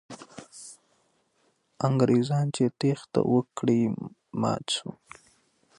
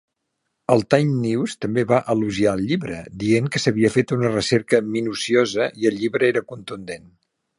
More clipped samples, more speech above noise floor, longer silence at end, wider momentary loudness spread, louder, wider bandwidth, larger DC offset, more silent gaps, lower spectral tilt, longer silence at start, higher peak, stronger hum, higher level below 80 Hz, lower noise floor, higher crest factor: neither; second, 44 dB vs 56 dB; first, 0.85 s vs 0.6 s; first, 21 LU vs 13 LU; second, -27 LUFS vs -20 LUFS; about the same, 11.5 kHz vs 11.5 kHz; neither; neither; about the same, -6.5 dB/octave vs -5.5 dB/octave; second, 0.1 s vs 0.7 s; second, -10 dBFS vs 0 dBFS; neither; second, -66 dBFS vs -54 dBFS; second, -70 dBFS vs -76 dBFS; about the same, 18 dB vs 20 dB